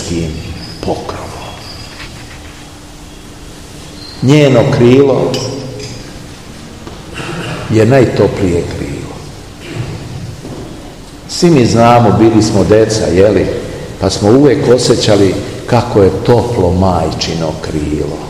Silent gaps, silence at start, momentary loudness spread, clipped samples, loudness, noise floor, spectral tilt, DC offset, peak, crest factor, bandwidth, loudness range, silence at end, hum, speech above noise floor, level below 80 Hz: none; 0 s; 22 LU; 2%; -10 LUFS; -31 dBFS; -6 dB/octave; 0.7%; 0 dBFS; 12 dB; 15 kHz; 11 LU; 0 s; none; 22 dB; -32 dBFS